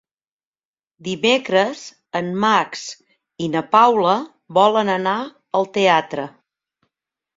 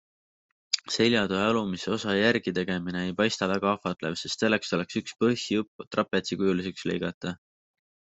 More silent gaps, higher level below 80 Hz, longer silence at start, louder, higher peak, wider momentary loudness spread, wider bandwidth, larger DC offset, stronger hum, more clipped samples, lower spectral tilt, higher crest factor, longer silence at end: second, none vs 5.68-5.79 s, 5.87-5.91 s, 7.14-7.21 s; about the same, -66 dBFS vs -66 dBFS; first, 1.05 s vs 0.75 s; first, -18 LUFS vs -27 LUFS; first, -2 dBFS vs -6 dBFS; first, 15 LU vs 8 LU; about the same, 7.8 kHz vs 8.2 kHz; neither; neither; neither; about the same, -4.5 dB/octave vs -4.5 dB/octave; about the same, 18 dB vs 22 dB; first, 1.1 s vs 0.85 s